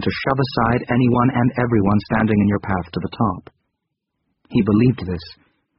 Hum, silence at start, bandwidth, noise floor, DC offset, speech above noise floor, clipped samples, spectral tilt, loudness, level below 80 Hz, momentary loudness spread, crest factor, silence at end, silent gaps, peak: none; 0 s; 5.8 kHz; -77 dBFS; under 0.1%; 59 dB; under 0.1%; -6.5 dB/octave; -19 LUFS; -42 dBFS; 9 LU; 16 dB; 0.45 s; none; -2 dBFS